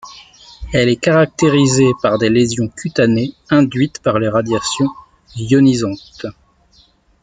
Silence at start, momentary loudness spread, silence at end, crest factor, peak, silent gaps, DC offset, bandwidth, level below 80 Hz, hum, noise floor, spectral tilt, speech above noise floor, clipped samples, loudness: 0.05 s; 15 LU; 0.9 s; 14 dB; 0 dBFS; none; under 0.1%; 9.6 kHz; -42 dBFS; none; -52 dBFS; -5.5 dB/octave; 38 dB; under 0.1%; -15 LUFS